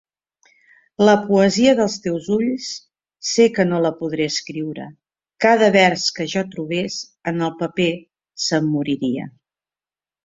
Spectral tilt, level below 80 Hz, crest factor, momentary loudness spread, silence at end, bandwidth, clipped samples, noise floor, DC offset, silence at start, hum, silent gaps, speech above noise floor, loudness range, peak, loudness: -4.5 dB/octave; -60 dBFS; 18 dB; 14 LU; 0.95 s; 7.8 kHz; under 0.1%; under -90 dBFS; under 0.1%; 1 s; none; none; over 72 dB; 5 LU; -2 dBFS; -19 LUFS